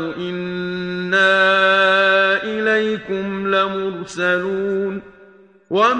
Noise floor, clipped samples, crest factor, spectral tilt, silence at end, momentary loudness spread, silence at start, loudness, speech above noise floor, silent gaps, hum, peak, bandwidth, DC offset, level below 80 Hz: -47 dBFS; under 0.1%; 14 dB; -5 dB/octave; 0 s; 12 LU; 0 s; -17 LUFS; 29 dB; none; none; -4 dBFS; 9.4 kHz; under 0.1%; -58 dBFS